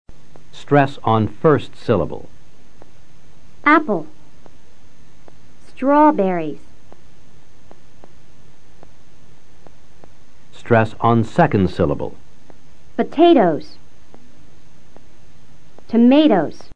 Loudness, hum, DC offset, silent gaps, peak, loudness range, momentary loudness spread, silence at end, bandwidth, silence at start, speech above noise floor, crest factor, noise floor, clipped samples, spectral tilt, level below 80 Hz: -16 LUFS; none; 5%; none; 0 dBFS; 5 LU; 14 LU; 0 s; 9.4 kHz; 0.05 s; 35 dB; 20 dB; -51 dBFS; under 0.1%; -8 dB/octave; -48 dBFS